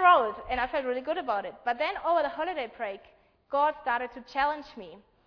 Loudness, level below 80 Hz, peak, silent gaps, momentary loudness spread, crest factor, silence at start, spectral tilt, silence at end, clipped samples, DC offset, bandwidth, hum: -29 LUFS; -58 dBFS; -8 dBFS; none; 11 LU; 20 dB; 0 s; -5 dB/octave; 0.3 s; under 0.1%; under 0.1%; 5.4 kHz; none